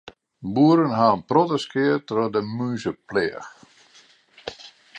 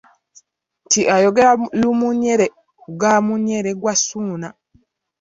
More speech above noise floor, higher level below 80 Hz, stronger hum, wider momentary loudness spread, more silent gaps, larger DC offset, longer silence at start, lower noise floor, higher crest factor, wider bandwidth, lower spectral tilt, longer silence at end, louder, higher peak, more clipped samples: second, 34 dB vs 42 dB; about the same, -62 dBFS vs -58 dBFS; neither; first, 20 LU vs 12 LU; neither; neither; second, 0.4 s vs 0.9 s; second, -55 dBFS vs -59 dBFS; about the same, 20 dB vs 16 dB; first, 8.8 kHz vs 7.8 kHz; first, -7 dB/octave vs -3.5 dB/octave; second, 0 s vs 0.7 s; second, -22 LUFS vs -17 LUFS; about the same, -4 dBFS vs -2 dBFS; neither